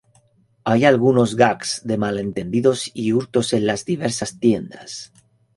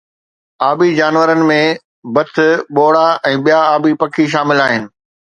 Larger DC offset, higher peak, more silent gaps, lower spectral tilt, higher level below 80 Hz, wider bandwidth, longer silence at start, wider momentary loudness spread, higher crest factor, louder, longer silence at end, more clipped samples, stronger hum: neither; about the same, -2 dBFS vs 0 dBFS; second, none vs 1.85-2.03 s; about the same, -5 dB/octave vs -5.5 dB/octave; first, -54 dBFS vs -60 dBFS; first, 11.5 kHz vs 9 kHz; about the same, 0.65 s vs 0.6 s; first, 11 LU vs 7 LU; about the same, 18 dB vs 14 dB; second, -19 LUFS vs -12 LUFS; about the same, 0.5 s vs 0.5 s; neither; neither